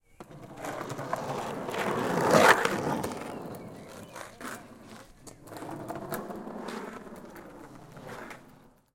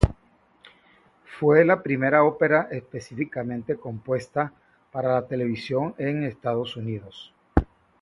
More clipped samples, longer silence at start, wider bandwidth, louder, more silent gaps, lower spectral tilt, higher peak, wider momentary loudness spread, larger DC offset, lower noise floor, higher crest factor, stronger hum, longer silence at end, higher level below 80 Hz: neither; first, 0.2 s vs 0 s; first, 17 kHz vs 11.5 kHz; second, -29 LUFS vs -24 LUFS; neither; second, -4 dB/octave vs -8 dB/octave; second, -4 dBFS vs 0 dBFS; first, 24 LU vs 15 LU; neither; second, -57 dBFS vs -61 dBFS; about the same, 28 dB vs 24 dB; neither; second, 0.25 s vs 0.4 s; second, -62 dBFS vs -38 dBFS